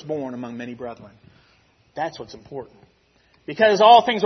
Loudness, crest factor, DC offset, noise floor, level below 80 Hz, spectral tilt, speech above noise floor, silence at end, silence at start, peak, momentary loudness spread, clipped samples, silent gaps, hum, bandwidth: -17 LUFS; 20 dB; under 0.1%; -60 dBFS; -64 dBFS; -4.5 dB/octave; 40 dB; 0 s; 0.05 s; -2 dBFS; 25 LU; under 0.1%; none; none; 6.4 kHz